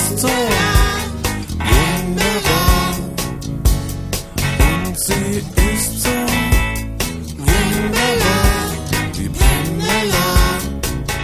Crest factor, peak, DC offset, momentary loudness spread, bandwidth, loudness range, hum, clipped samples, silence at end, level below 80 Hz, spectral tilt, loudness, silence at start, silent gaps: 16 dB; 0 dBFS; under 0.1%; 8 LU; 16 kHz; 2 LU; none; under 0.1%; 0 s; -20 dBFS; -4 dB/octave; -17 LUFS; 0 s; none